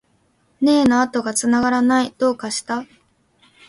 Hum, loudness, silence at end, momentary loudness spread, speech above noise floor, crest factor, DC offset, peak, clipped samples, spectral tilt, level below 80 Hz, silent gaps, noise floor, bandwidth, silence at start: none; -18 LUFS; 0.85 s; 9 LU; 44 dB; 16 dB; under 0.1%; -4 dBFS; under 0.1%; -3.5 dB/octave; -54 dBFS; none; -62 dBFS; 11.5 kHz; 0.6 s